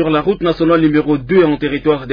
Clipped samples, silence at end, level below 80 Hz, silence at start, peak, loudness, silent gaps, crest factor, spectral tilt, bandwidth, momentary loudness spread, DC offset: under 0.1%; 0 s; -38 dBFS; 0 s; -2 dBFS; -14 LUFS; none; 12 dB; -9.5 dB/octave; 5.2 kHz; 4 LU; under 0.1%